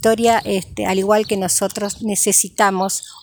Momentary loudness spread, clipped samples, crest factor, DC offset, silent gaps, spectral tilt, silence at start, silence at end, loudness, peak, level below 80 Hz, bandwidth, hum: 8 LU; under 0.1%; 18 dB; under 0.1%; none; -3 dB/octave; 0 s; 0.05 s; -17 LUFS; 0 dBFS; -50 dBFS; over 20 kHz; none